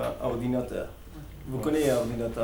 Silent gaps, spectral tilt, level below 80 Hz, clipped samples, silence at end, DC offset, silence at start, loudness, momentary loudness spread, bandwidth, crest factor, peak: none; -6 dB/octave; -46 dBFS; under 0.1%; 0 s; under 0.1%; 0 s; -29 LUFS; 18 LU; 19.5 kHz; 16 dB; -12 dBFS